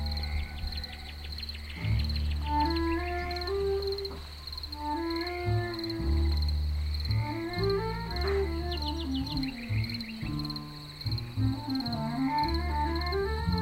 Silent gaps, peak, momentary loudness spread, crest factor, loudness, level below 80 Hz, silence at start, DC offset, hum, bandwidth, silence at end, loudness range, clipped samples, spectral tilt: none; -16 dBFS; 9 LU; 16 dB; -32 LUFS; -36 dBFS; 0 s; under 0.1%; none; 16 kHz; 0 s; 2 LU; under 0.1%; -6.5 dB/octave